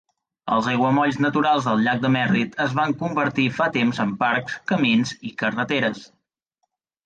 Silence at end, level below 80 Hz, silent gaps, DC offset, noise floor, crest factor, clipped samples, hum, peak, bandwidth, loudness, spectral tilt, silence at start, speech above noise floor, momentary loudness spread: 1 s; -62 dBFS; none; under 0.1%; -76 dBFS; 14 dB; under 0.1%; none; -8 dBFS; 9 kHz; -21 LUFS; -6 dB/octave; 0.45 s; 55 dB; 6 LU